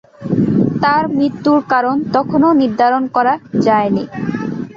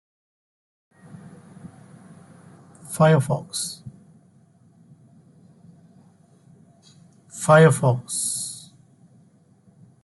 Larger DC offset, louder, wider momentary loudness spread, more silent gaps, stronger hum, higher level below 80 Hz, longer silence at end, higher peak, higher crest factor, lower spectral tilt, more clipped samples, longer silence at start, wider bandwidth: neither; first, -15 LUFS vs -20 LUFS; second, 7 LU vs 30 LU; neither; neither; first, -50 dBFS vs -64 dBFS; second, 0.05 s vs 1.45 s; about the same, -2 dBFS vs -4 dBFS; second, 12 dB vs 22 dB; first, -8 dB/octave vs -5.5 dB/octave; neither; second, 0.2 s vs 1.65 s; second, 7.2 kHz vs 12 kHz